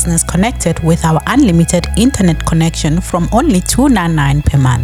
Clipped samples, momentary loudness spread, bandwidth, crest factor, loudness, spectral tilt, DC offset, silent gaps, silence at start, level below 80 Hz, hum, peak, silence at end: under 0.1%; 4 LU; 15.5 kHz; 10 dB; -12 LUFS; -5.5 dB/octave; under 0.1%; none; 0 s; -22 dBFS; none; 0 dBFS; 0 s